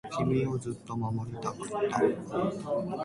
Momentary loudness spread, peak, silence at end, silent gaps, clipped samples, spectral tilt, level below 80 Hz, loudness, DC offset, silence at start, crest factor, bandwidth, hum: 8 LU; -12 dBFS; 0 s; none; under 0.1%; -7 dB/octave; -58 dBFS; -31 LUFS; under 0.1%; 0.05 s; 18 dB; 11.5 kHz; none